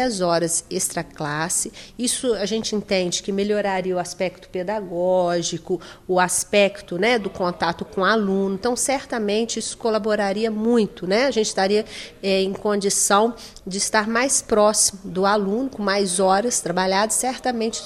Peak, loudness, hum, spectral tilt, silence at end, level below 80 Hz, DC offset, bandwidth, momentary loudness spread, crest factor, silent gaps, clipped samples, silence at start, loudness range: -4 dBFS; -21 LUFS; none; -3 dB/octave; 0 s; -52 dBFS; under 0.1%; 16 kHz; 8 LU; 18 dB; none; under 0.1%; 0 s; 4 LU